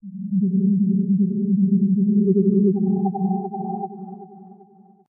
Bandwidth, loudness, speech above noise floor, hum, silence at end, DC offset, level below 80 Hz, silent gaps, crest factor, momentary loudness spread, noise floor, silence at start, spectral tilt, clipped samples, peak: 1 kHz; -20 LUFS; 31 dB; none; 0.55 s; under 0.1%; -74 dBFS; none; 14 dB; 13 LU; -50 dBFS; 0.05 s; -18 dB/octave; under 0.1%; -6 dBFS